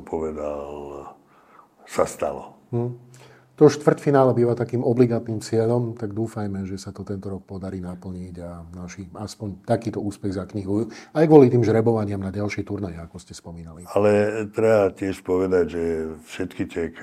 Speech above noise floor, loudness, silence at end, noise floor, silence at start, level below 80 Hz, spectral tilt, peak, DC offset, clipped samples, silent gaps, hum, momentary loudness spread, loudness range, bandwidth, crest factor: 31 dB; -22 LUFS; 0 s; -53 dBFS; 0 s; -56 dBFS; -7.5 dB/octave; 0 dBFS; under 0.1%; under 0.1%; none; none; 19 LU; 10 LU; 14.5 kHz; 22 dB